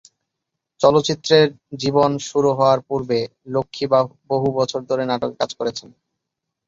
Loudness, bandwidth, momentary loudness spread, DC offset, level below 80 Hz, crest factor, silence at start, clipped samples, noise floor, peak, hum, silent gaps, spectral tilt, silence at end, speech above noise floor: -19 LUFS; 7.8 kHz; 9 LU; under 0.1%; -58 dBFS; 18 dB; 0.8 s; under 0.1%; -81 dBFS; -2 dBFS; none; none; -5 dB/octave; 0.8 s; 62 dB